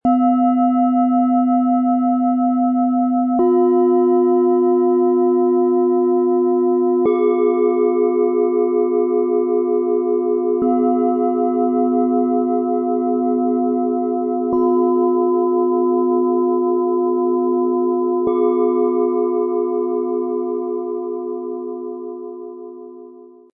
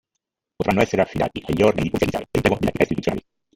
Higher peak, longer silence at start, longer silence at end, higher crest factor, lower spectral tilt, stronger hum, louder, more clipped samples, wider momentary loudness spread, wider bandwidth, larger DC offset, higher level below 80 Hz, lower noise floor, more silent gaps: second, -6 dBFS vs -2 dBFS; second, 0.05 s vs 0.6 s; about the same, 0.3 s vs 0.35 s; second, 10 dB vs 20 dB; first, -12 dB/octave vs -6.5 dB/octave; neither; first, -17 LUFS vs -21 LUFS; neither; about the same, 8 LU vs 7 LU; second, 3 kHz vs 17 kHz; neither; second, -64 dBFS vs -42 dBFS; second, -41 dBFS vs -81 dBFS; neither